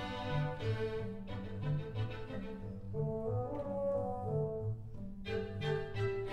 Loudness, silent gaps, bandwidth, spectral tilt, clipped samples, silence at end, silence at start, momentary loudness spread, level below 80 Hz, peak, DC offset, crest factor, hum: -39 LUFS; none; 8.8 kHz; -8 dB/octave; under 0.1%; 0 s; 0 s; 8 LU; -52 dBFS; -24 dBFS; under 0.1%; 14 dB; none